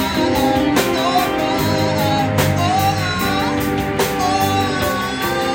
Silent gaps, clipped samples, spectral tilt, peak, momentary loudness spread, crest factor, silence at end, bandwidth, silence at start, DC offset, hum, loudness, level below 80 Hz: none; under 0.1%; -5 dB/octave; -2 dBFS; 3 LU; 16 dB; 0 s; 17 kHz; 0 s; under 0.1%; none; -17 LUFS; -38 dBFS